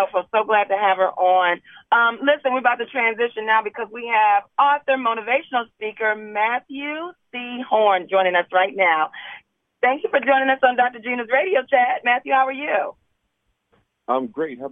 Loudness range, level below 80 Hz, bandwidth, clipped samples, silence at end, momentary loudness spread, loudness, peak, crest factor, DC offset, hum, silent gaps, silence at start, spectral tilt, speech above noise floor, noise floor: 3 LU; -76 dBFS; 3.8 kHz; under 0.1%; 0 s; 11 LU; -20 LUFS; -2 dBFS; 20 dB; under 0.1%; none; none; 0 s; -5.5 dB/octave; 52 dB; -72 dBFS